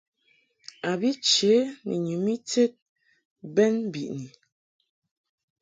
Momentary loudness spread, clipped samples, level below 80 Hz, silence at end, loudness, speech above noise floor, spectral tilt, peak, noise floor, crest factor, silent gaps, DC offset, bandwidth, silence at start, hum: 14 LU; under 0.1%; -74 dBFS; 1.35 s; -25 LUFS; 43 dB; -4 dB/octave; -8 dBFS; -67 dBFS; 18 dB; 2.82-2.96 s, 3.25-3.36 s; under 0.1%; 9.6 kHz; 0.85 s; none